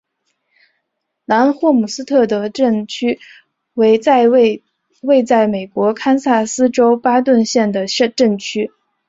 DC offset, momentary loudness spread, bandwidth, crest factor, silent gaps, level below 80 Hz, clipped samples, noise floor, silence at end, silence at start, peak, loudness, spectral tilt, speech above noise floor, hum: under 0.1%; 9 LU; 8 kHz; 14 dB; none; -60 dBFS; under 0.1%; -73 dBFS; 0.4 s; 1.3 s; -2 dBFS; -14 LUFS; -4.5 dB/octave; 59 dB; none